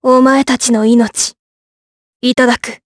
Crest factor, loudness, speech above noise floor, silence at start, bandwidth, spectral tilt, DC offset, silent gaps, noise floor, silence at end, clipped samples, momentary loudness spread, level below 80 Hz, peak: 12 dB; -12 LUFS; over 79 dB; 0.05 s; 11 kHz; -3 dB/octave; under 0.1%; 1.39-2.20 s; under -90 dBFS; 0.1 s; under 0.1%; 8 LU; -50 dBFS; 0 dBFS